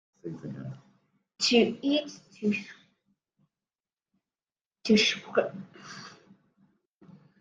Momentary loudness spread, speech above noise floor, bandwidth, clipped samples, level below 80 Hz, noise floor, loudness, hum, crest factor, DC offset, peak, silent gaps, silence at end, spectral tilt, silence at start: 22 LU; over 62 dB; 9.4 kHz; under 0.1%; -72 dBFS; under -90 dBFS; -27 LUFS; none; 24 dB; under 0.1%; -8 dBFS; 4.61-4.71 s; 1.3 s; -4 dB/octave; 0.25 s